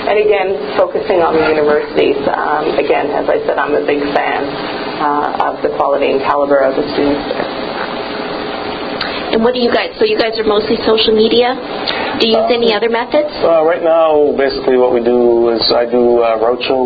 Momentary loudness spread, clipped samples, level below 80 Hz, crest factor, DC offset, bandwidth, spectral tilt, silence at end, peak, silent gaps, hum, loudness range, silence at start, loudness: 8 LU; under 0.1%; -44 dBFS; 12 dB; under 0.1%; 6.2 kHz; -7 dB/octave; 0 s; 0 dBFS; none; none; 4 LU; 0 s; -13 LUFS